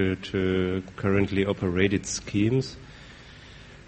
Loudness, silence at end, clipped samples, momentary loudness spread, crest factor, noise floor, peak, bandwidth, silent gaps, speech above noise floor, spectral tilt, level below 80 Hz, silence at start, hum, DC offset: -26 LUFS; 0.1 s; under 0.1%; 22 LU; 20 dB; -47 dBFS; -6 dBFS; 8.4 kHz; none; 21 dB; -5.5 dB/octave; -50 dBFS; 0 s; none; under 0.1%